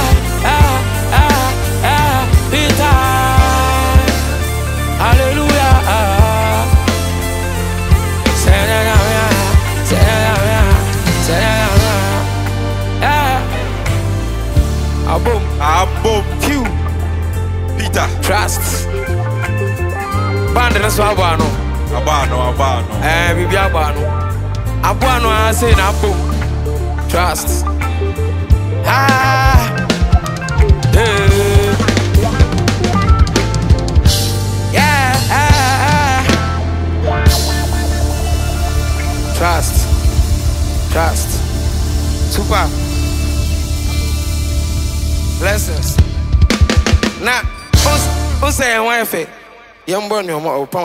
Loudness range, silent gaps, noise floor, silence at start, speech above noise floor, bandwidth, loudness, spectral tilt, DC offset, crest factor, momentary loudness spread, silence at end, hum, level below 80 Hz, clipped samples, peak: 4 LU; none; -39 dBFS; 0 s; 26 dB; 16.5 kHz; -14 LUFS; -5 dB/octave; under 0.1%; 12 dB; 7 LU; 0 s; none; -18 dBFS; under 0.1%; 0 dBFS